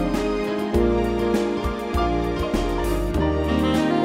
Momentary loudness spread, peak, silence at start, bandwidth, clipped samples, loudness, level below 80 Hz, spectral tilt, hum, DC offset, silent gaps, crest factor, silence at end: 4 LU; -6 dBFS; 0 s; 16 kHz; under 0.1%; -23 LUFS; -30 dBFS; -6.5 dB/octave; none; under 0.1%; none; 14 dB; 0 s